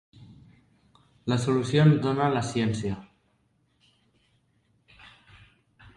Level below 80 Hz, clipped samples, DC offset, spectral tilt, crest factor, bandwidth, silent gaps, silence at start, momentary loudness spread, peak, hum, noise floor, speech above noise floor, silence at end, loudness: -58 dBFS; under 0.1%; under 0.1%; -7 dB/octave; 20 dB; 11 kHz; none; 1.25 s; 14 LU; -8 dBFS; none; -69 dBFS; 45 dB; 2.95 s; -25 LUFS